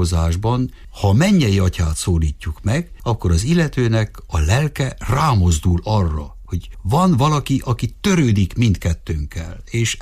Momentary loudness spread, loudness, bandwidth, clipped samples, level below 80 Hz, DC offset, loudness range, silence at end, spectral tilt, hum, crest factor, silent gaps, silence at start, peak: 11 LU; -18 LUFS; 15.5 kHz; under 0.1%; -30 dBFS; under 0.1%; 1 LU; 0 s; -6 dB/octave; none; 12 dB; none; 0 s; -4 dBFS